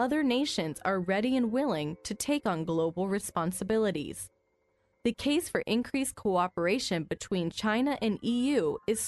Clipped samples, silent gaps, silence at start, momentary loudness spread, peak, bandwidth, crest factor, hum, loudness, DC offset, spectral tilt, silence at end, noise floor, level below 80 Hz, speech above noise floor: under 0.1%; none; 0 s; 6 LU; -14 dBFS; 12 kHz; 16 dB; none; -30 LUFS; under 0.1%; -4.5 dB/octave; 0 s; -73 dBFS; -60 dBFS; 43 dB